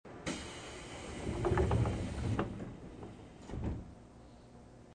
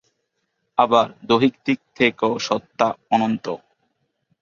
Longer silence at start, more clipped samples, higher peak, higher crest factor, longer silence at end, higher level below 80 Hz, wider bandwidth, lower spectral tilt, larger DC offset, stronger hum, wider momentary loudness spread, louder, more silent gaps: second, 0.05 s vs 0.8 s; neither; second, -20 dBFS vs -2 dBFS; about the same, 20 dB vs 20 dB; second, 0 s vs 0.85 s; first, -46 dBFS vs -62 dBFS; first, 9.8 kHz vs 7.4 kHz; first, -6.5 dB/octave vs -5 dB/octave; neither; neither; first, 24 LU vs 8 LU; second, -38 LUFS vs -20 LUFS; neither